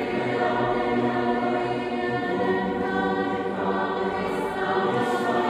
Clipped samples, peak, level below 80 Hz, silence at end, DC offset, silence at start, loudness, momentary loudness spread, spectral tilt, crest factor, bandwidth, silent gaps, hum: under 0.1%; -10 dBFS; -54 dBFS; 0 s; under 0.1%; 0 s; -25 LUFS; 3 LU; -6.5 dB/octave; 14 dB; 13 kHz; none; none